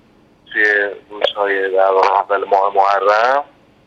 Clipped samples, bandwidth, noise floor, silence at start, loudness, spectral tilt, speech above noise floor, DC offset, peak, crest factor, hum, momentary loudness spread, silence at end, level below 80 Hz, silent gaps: under 0.1%; 7.6 kHz; -49 dBFS; 0.5 s; -15 LUFS; -2.5 dB/octave; 35 dB; under 0.1%; 0 dBFS; 16 dB; none; 7 LU; 0.45 s; -64 dBFS; none